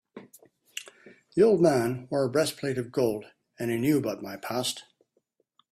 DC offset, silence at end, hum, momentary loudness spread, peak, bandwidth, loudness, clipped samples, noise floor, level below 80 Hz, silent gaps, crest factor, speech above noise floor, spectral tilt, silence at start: under 0.1%; 0.9 s; none; 18 LU; -10 dBFS; 16 kHz; -27 LUFS; under 0.1%; -73 dBFS; -66 dBFS; none; 18 dB; 48 dB; -5.5 dB/octave; 0.15 s